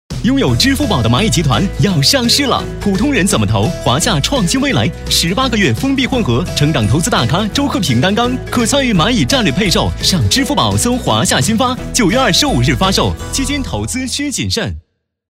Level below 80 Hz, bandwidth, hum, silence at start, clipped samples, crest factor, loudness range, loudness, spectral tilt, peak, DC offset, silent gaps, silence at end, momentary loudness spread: -28 dBFS; 16.5 kHz; none; 0.1 s; under 0.1%; 12 dB; 1 LU; -13 LUFS; -4 dB/octave; 0 dBFS; under 0.1%; none; 0.55 s; 5 LU